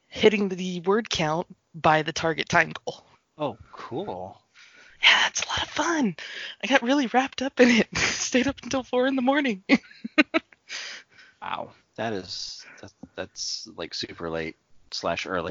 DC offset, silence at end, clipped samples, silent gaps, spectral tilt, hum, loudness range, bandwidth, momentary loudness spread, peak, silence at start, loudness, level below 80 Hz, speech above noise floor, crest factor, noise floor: under 0.1%; 0 s; under 0.1%; none; -3.5 dB/octave; none; 11 LU; 7.6 kHz; 16 LU; -2 dBFS; 0.1 s; -25 LUFS; -56 dBFS; 28 dB; 24 dB; -53 dBFS